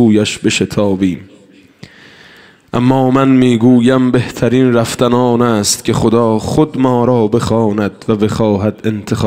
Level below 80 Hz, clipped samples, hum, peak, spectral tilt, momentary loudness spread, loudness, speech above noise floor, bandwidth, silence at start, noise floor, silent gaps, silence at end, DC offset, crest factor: -42 dBFS; under 0.1%; none; 0 dBFS; -6 dB/octave; 7 LU; -12 LUFS; 32 dB; 16 kHz; 0 s; -43 dBFS; none; 0 s; under 0.1%; 12 dB